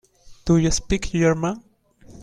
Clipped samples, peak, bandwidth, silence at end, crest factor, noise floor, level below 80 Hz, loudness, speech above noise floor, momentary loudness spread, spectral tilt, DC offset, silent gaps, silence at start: under 0.1%; -6 dBFS; 10.5 kHz; 0 s; 16 dB; -48 dBFS; -36 dBFS; -21 LUFS; 29 dB; 11 LU; -5.5 dB/octave; under 0.1%; none; 0.3 s